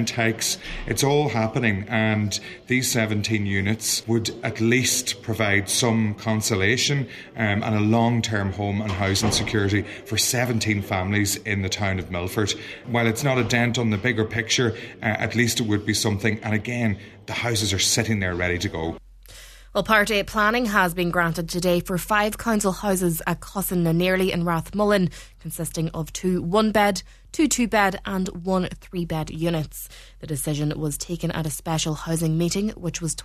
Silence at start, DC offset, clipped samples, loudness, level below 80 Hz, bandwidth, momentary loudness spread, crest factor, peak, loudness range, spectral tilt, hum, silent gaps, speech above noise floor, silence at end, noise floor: 0 s; under 0.1%; under 0.1%; -23 LUFS; -44 dBFS; 14 kHz; 8 LU; 22 dB; -2 dBFS; 3 LU; -4 dB/octave; none; none; 22 dB; 0 s; -45 dBFS